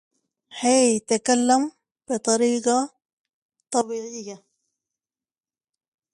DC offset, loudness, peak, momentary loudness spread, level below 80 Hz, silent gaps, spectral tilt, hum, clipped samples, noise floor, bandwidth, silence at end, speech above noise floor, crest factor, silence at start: under 0.1%; -22 LUFS; -6 dBFS; 15 LU; -74 dBFS; 3.13-3.25 s, 3.33-3.49 s; -2.5 dB/octave; none; under 0.1%; under -90 dBFS; 11.5 kHz; 1.75 s; over 69 dB; 18 dB; 0.55 s